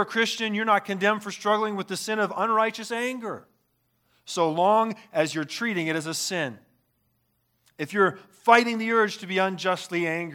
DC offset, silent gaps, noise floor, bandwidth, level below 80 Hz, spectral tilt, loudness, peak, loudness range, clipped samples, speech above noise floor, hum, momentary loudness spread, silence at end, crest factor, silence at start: under 0.1%; none; -71 dBFS; 18 kHz; -78 dBFS; -4 dB/octave; -25 LUFS; -2 dBFS; 4 LU; under 0.1%; 46 dB; none; 9 LU; 0 s; 24 dB; 0 s